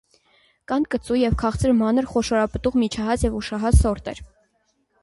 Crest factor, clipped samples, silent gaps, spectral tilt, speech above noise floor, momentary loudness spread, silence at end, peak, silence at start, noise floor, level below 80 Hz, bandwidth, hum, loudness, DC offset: 18 dB; under 0.1%; none; -6.5 dB/octave; 47 dB; 7 LU; 0.8 s; -4 dBFS; 0.7 s; -68 dBFS; -30 dBFS; 11.5 kHz; none; -22 LUFS; under 0.1%